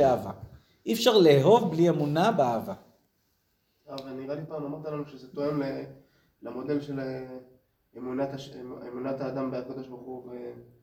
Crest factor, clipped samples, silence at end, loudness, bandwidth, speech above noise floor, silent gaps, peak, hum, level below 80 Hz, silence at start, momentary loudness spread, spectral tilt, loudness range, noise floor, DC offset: 20 dB; under 0.1%; 0.2 s; -27 LUFS; 17 kHz; 45 dB; none; -8 dBFS; none; -64 dBFS; 0 s; 21 LU; -6 dB/octave; 12 LU; -73 dBFS; under 0.1%